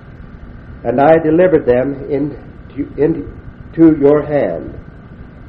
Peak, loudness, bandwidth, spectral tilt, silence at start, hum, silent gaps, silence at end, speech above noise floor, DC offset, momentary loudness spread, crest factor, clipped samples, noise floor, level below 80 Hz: 0 dBFS; -13 LUFS; 4.3 kHz; -11 dB/octave; 0.1 s; none; none; 0 s; 22 dB; under 0.1%; 21 LU; 14 dB; 0.1%; -34 dBFS; -38 dBFS